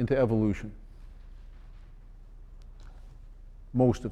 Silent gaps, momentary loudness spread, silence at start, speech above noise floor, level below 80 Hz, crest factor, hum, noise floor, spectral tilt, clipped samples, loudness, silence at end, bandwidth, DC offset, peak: none; 27 LU; 0 s; 22 dB; -46 dBFS; 20 dB; none; -48 dBFS; -8.5 dB/octave; under 0.1%; -28 LUFS; 0 s; 9.2 kHz; under 0.1%; -12 dBFS